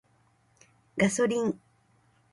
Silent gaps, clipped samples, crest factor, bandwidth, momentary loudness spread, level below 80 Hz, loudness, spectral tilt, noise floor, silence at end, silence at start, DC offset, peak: none; under 0.1%; 20 dB; 11.5 kHz; 14 LU; -66 dBFS; -28 LUFS; -5 dB/octave; -66 dBFS; 0.75 s; 0.95 s; under 0.1%; -10 dBFS